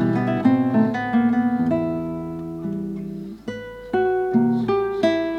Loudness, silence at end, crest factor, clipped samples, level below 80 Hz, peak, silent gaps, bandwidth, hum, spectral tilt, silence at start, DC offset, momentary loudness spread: -21 LUFS; 0 s; 16 dB; under 0.1%; -52 dBFS; -6 dBFS; none; 6.6 kHz; none; -8.5 dB/octave; 0 s; under 0.1%; 14 LU